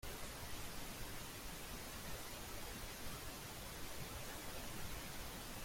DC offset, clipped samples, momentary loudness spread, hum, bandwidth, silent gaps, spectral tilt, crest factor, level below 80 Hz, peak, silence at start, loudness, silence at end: under 0.1%; under 0.1%; 1 LU; none; 16.5 kHz; none; -3 dB/octave; 14 dB; -56 dBFS; -34 dBFS; 0 s; -49 LUFS; 0 s